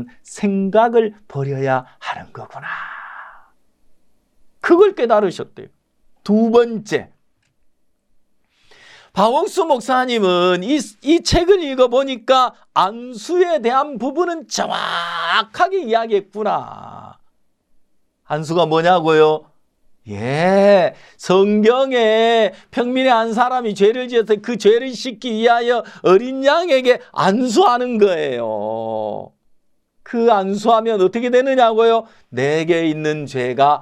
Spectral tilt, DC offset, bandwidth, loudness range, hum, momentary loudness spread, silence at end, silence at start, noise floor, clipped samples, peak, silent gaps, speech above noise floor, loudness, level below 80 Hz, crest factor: -5 dB/octave; under 0.1%; 12.5 kHz; 6 LU; none; 13 LU; 0 s; 0 s; -61 dBFS; under 0.1%; -2 dBFS; none; 45 dB; -16 LUFS; -46 dBFS; 16 dB